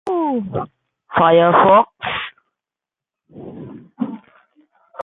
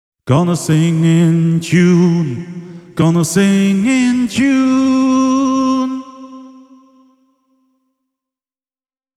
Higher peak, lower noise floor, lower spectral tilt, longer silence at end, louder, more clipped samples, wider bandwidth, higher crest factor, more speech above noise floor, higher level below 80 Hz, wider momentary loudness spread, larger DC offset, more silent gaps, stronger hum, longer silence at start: about the same, -2 dBFS vs 0 dBFS; about the same, -88 dBFS vs under -90 dBFS; first, -8 dB/octave vs -6.5 dB/octave; second, 0.85 s vs 2.7 s; second, -16 LUFS vs -13 LUFS; neither; second, 4 kHz vs 13.5 kHz; about the same, 18 dB vs 14 dB; second, 74 dB vs over 78 dB; second, -56 dBFS vs -50 dBFS; first, 25 LU vs 14 LU; neither; neither; neither; second, 0.05 s vs 0.25 s